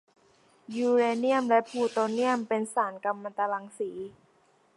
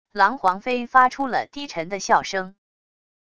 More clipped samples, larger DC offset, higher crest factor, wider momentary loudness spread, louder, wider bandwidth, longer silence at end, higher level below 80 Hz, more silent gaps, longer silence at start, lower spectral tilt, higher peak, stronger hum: neither; second, under 0.1% vs 0.4%; about the same, 18 dB vs 20 dB; about the same, 12 LU vs 12 LU; second, -28 LUFS vs -21 LUFS; about the same, 11.5 kHz vs 11 kHz; about the same, 0.65 s vs 0.75 s; second, -80 dBFS vs -60 dBFS; neither; first, 0.7 s vs 0.15 s; first, -4.5 dB/octave vs -3 dB/octave; second, -10 dBFS vs -2 dBFS; neither